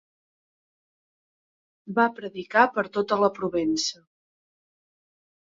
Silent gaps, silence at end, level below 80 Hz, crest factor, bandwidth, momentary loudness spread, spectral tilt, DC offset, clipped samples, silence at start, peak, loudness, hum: none; 1.55 s; -68 dBFS; 24 dB; 7.8 kHz; 8 LU; -3.5 dB/octave; under 0.1%; under 0.1%; 1.85 s; -4 dBFS; -24 LUFS; none